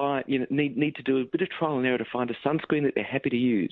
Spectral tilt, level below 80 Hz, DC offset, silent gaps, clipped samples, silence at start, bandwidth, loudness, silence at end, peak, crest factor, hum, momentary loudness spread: -10 dB/octave; -68 dBFS; under 0.1%; none; under 0.1%; 0 s; 4.3 kHz; -27 LUFS; 0.05 s; -10 dBFS; 16 dB; none; 3 LU